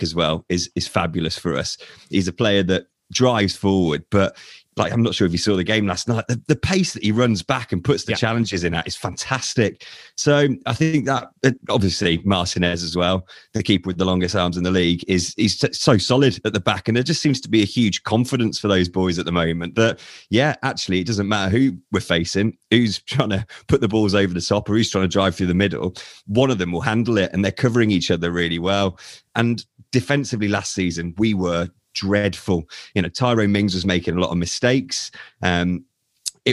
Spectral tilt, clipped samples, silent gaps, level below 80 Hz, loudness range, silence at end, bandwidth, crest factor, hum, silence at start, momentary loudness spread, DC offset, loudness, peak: -5 dB/octave; under 0.1%; none; -46 dBFS; 3 LU; 0 s; 12.5 kHz; 20 dB; none; 0 s; 7 LU; under 0.1%; -20 LUFS; 0 dBFS